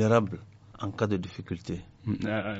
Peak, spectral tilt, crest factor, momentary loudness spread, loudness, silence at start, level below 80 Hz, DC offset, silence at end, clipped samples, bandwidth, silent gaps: -8 dBFS; -6.5 dB/octave; 22 dB; 13 LU; -32 LUFS; 0 s; -56 dBFS; under 0.1%; 0 s; under 0.1%; 8 kHz; none